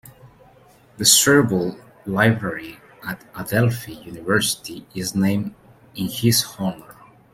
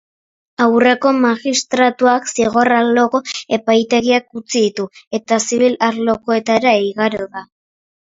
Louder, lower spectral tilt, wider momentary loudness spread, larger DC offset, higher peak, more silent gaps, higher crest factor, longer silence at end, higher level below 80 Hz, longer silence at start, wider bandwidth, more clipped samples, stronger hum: second, -19 LUFS vs -15 LUFS; about the same, -3.5 dB/octave vs -3.5 dB/octave; first, 19 LU vs 8 LU; neither; about the same, 0 dBFS vs 0 dBFS; second, none vs 5.07-5.11 s; first, 22 dB vs 16 dB; second, 0.4 s vs 0.7 s; about the same, -54 dBFS vs -58 dBFS; second, 0.05 s vs 0.6 s; first, 16.5 kHz vs 7.8 kHz; neither; neither